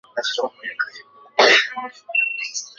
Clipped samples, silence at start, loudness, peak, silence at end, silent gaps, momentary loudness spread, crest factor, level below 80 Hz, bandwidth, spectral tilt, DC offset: under 0.1%; 0.15 s; -19 LUFS; -2 dBFS; 0.1 s; none; 14 LU; 20 dB; -74 dBFS; 8 kHz; 0.5 dB/octave; under 0.1%